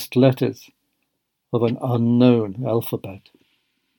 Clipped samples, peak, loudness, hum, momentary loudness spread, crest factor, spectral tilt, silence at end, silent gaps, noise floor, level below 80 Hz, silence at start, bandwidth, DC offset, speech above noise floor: under 0.1%; -2 dBFS; -20 LUFS; none; 14 LU; 18 dB; -8 dB/octave; 0.8 s; none; -75 dBFS; -68 dBFS; 0 s; 19 kHz; under 0.1%; 55 dB